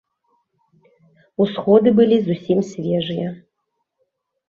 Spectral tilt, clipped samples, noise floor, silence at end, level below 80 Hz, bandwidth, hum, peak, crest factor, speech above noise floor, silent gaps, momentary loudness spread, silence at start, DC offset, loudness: -8 dB/octave; under 0.1%; -75 dBFS; 1.1 s; -62 dBFS; 7.2 kHz; none; -2 dBFS; 18 dB; 58 dB; none; 13 LU; 1.4 s; under 0.1%; -18 LUFS